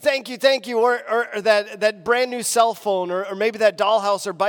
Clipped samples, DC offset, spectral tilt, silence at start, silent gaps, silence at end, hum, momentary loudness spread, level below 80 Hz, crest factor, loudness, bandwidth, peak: under 0.1%; under 0.1%; -2 dB/octave; 0 s; none; 0 s; none; 4 LU; -70 dBFS; 16 dB; -20 LUFS; 19 kHz; -4 dBFS